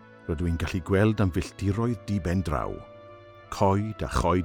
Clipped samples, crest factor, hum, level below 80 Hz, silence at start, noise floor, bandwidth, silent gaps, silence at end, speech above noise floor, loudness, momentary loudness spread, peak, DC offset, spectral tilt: under 0.1%; 18 dB; none; -42 dBFS; 0 s; -48 dBFS; 16 kHz; none; 0 s; 22 dB; -27 LUFS; 13 LU; -8 dBFS; under 0.1%; -7 dB/octave